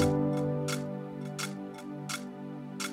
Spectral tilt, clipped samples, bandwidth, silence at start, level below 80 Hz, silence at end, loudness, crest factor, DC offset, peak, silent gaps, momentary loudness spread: -5.5 dB/octave; under 0.1%; 16.5 kHz; 0 s; -60 dBFS; 0 s; -35 LUFS; 18 dB; under 0.1%; -14 dBFS; none; 12 LU